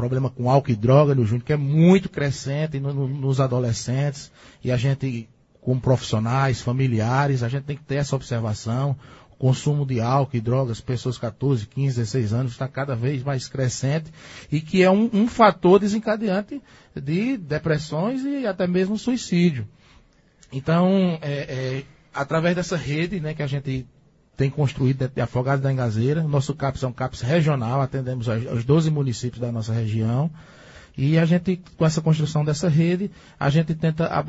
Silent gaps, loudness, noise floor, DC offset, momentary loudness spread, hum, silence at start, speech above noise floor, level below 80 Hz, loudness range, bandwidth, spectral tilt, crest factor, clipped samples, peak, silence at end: none; -22 LUFS; -55 dBFS; under 0.1%; 10 LU; none; 0 s; 34 dB; -50 dBFS; 5 LU; 8 kHz; -7 dB/octave; 22 dB; under 0.1%; 0 dBFS; 0 s